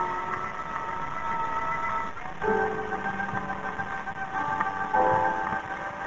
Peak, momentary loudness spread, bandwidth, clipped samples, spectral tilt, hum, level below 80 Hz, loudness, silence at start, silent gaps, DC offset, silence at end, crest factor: -10 dBFS; 8 LU; 8 kHz; under 0.1%; -5.5 dB/octave; none; -52 dBFS; -29 LUFS; 0 s; none; under 0.1%; 0 s; 18 dB